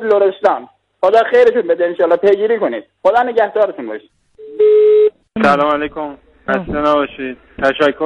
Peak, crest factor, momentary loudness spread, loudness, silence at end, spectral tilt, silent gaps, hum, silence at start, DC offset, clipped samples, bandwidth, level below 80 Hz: -2 dBFS; 12 dB; 16 LU; -14 LUFS; 0 s; -6 dB/octave; none; none; 0 s; under 0.1%; under 0.1%; 7.6 kHz; -46 dBFS